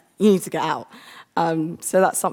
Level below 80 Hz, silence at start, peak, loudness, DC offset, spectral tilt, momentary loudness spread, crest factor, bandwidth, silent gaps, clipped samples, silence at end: -70 dBFS; 0.2 s; -4 dBFS; -21 LUFS; under 0.1%; -5 dB/octave; 11 LU; 18 dB; 19.5 kHz; none; under 0.1%; 0 s